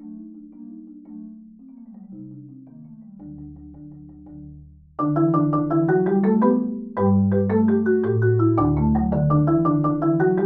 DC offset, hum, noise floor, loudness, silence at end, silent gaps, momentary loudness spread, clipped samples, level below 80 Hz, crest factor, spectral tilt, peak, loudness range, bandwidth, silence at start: under 0.1%; none; -44 dBFS; -20 LUFS; 0 s; none; 23 LU; under 0.1%; -42 dBFS; 16 dB; -13 dB/octave; -6 dBFS; 22 LU; 2.4 kHz; 0 s